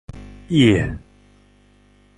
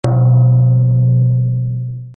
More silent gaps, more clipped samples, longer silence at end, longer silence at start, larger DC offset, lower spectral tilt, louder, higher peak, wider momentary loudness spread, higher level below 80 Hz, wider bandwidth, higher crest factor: neither; neither; first, 1.2 s vs 0.05 s; about the same, 0.15 s vs 0.05 s; neither; second, -6.5 dB/octave vs -11.5 dB/octave; second, -18 LUFS vs -13 LUFS; about the same, -2 dBFS vs -2 dBFS; first, 25 LU vs 9 LU; about the same, -40 dBFS vs -42 dBFS; first, 11 kHz vs 3 kHz; first, 20 dB vs 10 dB